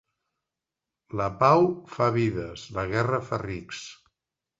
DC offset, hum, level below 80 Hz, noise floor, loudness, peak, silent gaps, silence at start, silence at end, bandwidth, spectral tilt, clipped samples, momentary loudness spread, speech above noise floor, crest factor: under 0.1%; none; -54 dBFS; -88 dBFS; -26 LUFS; -6 dBFS; none; 1.15 s; 0.65 s; 8 kHz; -7 dB/octave; under 0.1%; 16 LU; 62 dB; 22 dB